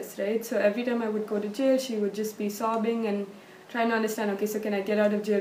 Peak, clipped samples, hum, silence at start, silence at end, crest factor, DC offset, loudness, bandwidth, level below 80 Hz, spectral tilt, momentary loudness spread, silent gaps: -12 dBFS; under 0.1%; none; 0 s; 0 s; 16 dB; under 0.1%; -28 LUFS; 15.5 kHz; -80 dBFS; -5 dB/octave; 6 LU; none